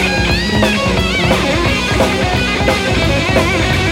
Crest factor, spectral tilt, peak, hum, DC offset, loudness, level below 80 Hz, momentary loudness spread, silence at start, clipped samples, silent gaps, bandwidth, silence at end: 12 dB; -4.5 dB/octave; 0 dBFS; none; under 0.1%; -13 LUFS; -24 dBFS; 1 LU; 0 s; under 0.1%; none; 16.5 kHz; 0 s